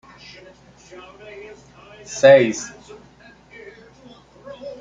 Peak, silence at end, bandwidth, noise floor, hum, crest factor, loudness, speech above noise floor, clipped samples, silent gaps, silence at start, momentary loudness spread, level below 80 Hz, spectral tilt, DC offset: -2 dBFS; 0.05 s; 7.8 kHz; -48 dBFS; none; 20 dB; -15 LUFS; 30 dB; under 0.1%; none; 2.1 s; 30 LU; -60 dBFS; -4.5 dB/octave; under 0.1%